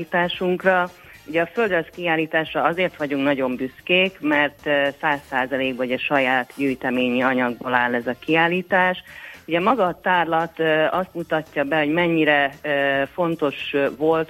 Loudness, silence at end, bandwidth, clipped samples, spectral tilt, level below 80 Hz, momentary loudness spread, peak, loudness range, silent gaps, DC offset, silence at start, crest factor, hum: -21 LUFS; 0.05 s; 16 kHz; under 0.1%; -6 dB/octave; -58 dBFS; 6 LU; -2 dBFS; 1 LU; none; under 0.1%; 0 s; 20 dB; none